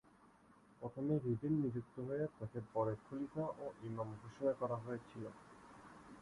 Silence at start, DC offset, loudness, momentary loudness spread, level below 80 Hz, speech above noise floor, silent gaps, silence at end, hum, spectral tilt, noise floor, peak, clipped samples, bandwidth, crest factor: 0.25 s; under 0.1%; -43 LUFS; 18 LU; -72 dBFS; 25 dB; none; 0 s; none; -9.5 dB/octave; -67 dBFS; -26 dBFS; under 0.1%; 11.5 kHz; 18 dB